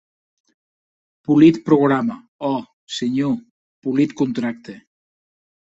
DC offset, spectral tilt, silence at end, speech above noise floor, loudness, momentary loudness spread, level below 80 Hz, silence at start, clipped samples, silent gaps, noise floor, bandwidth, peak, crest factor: under 0.1%; -7 dB/octave; 1 s; over 72 dB; -19 LUFS; 17 LU; -62 dBFS; 1.3 s; under 0.1%; 2.28-2.39 s, 2.73-2.87 s, 3.51-3.82 s; under -90 dBFS; 8 kHz; -2 dBFS; 18 dB